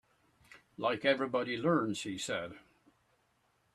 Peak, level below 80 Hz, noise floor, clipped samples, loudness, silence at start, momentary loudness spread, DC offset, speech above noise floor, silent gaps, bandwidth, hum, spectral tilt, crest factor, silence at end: -16 dBFS; -74 dBFS; -74 dBFS; under 0.1%; -33 LUFS; 0.5 s; 9 LU; under 0.1%; 41 dB; none; 13 kHz; none; -4.5 dB/octave; 20 dB; 1.15 s